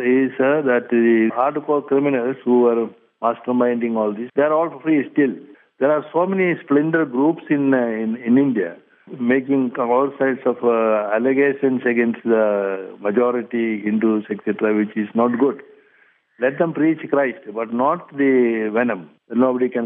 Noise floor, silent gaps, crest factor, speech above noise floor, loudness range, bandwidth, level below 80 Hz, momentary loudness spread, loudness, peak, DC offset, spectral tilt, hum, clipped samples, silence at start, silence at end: -57 dBFS; none; 14 dB; 39 dB; 2 LU; 3.7 kHz; -78 dBFS; 7 LU; -19 LUFS; -4 dBFS; under 0.1%; -10.5 dB/octave; none; under 0.1%; 0 s; 0 s